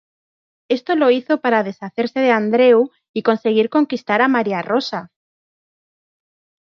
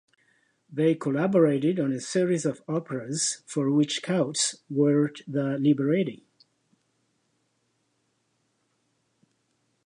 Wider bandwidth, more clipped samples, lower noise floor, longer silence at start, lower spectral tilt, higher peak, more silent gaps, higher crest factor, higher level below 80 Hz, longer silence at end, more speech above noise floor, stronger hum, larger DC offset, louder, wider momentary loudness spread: second, 6.6 kHz vs 11 kHz; neither; first, under -90 dBFS vs -73 dBFS; about the same, 0.7 s vs 0.7 s; first, -6.5 dB/octave vs -5 dB/octave; first, -2 dBFS vs -10 dBFS; first, 3.09-3.14 s vs none; about the same, 16 dB vs 18 dB; first, -72 dBFS vs -78 dBFS; second, 1.7 s vs 3.7 s; first, over 74 dB vs 48 dB; neither; neither; first, -17 LUFS vs -26 LUFS; about the same, 10 LU vs 8 LU